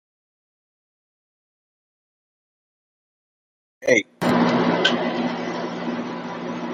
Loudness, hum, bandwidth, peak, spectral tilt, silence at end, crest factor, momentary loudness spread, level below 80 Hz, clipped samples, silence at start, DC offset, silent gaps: -22 LUFS; none; 13.5 kHz; -2 dBFS; -4.5 dB/octave; 0 s; 24 dB; 11 LU; -66 dBFS; under 0.1%; 3.8 s; under 0.1%; none